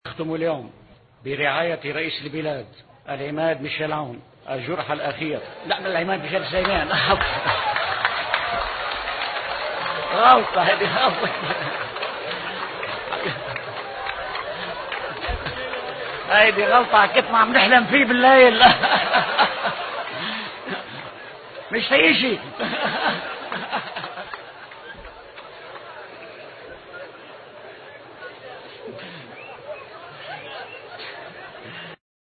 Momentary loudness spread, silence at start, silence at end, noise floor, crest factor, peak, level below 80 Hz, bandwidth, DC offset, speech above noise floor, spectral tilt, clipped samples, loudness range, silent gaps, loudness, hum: 24 LU; 0.05 s; 0.35 s; -41 dBFS; 22 dB; 0 dBFS; -48 dBFS; 4.8 kHz; under 0.1%; 22 dB; -8.5 dB/octave; under 0.1%; 23 LU; none; -20 LUFS; none